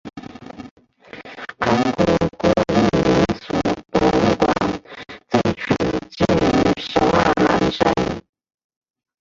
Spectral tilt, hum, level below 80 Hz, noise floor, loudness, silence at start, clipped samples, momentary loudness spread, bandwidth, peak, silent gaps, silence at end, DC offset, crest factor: -6 dB/octave; none; -40 dBFS; -41 dBFS; -18 LUFS; 0.05 s; under 0.1%; 20 LU; 7.8 kHz; -2 dBFS; 0.71-0.77 s; 1 s; under 0.1%; 18 dB